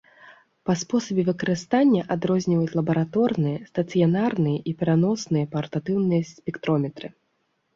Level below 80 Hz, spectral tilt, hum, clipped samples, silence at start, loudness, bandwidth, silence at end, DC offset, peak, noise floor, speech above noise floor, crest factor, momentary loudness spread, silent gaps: -62 dBFS; -7 dB/octave; none; under 0.1%; 0.25 s; -24 LUFS; 7.6 kHz; 0.65 s; under 0.1%; -8 dBFS; -72 dBFS; 49 dB; 16 dB; 8 LU; none